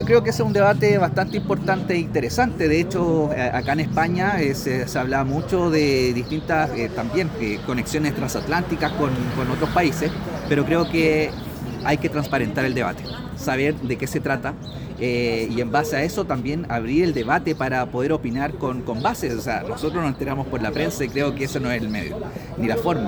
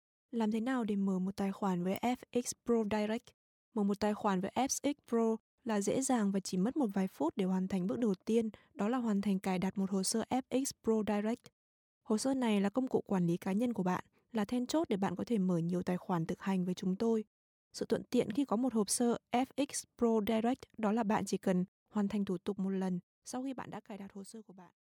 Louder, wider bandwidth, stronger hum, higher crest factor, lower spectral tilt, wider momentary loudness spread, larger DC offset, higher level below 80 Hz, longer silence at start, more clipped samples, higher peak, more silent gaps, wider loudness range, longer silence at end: first, -22 LUFS vs -35 LUFS; about the same, over 20 kHz vs 18.5 kHz; neither; about the same, 18 dB vs 16 dB; about the same, -6 dB/octave vs -5.5 dB/octave; about the same, 7 LU vs 8 LU; neither; first, -42 dBFS vs -70 dBFS; second, 0 s vs 0.35 s; neither; first, -4 dBFS vs -20 dBFS; second, none vs 3.34-3.72 s, 5.40-5.58 s, 11.53-12.01 s, 17.27-17.71 s, 21.68-21.86 s, 23.03-23.22 s; about the same, 3 LU vs 2 LU; second, 0 s vs 0.25 s